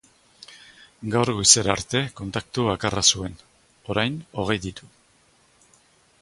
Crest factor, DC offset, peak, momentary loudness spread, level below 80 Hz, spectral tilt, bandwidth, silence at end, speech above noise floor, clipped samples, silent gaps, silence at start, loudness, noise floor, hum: 24 dB; under 0.1%; 0 dBFS; 20 LU; -50 dBFS; -2.5 dB/octave; 11.5 kHz; 1.35 s; 37 dB; under 0.1%; none; 0.5 s; -21 LUFS; -60 dBFS; none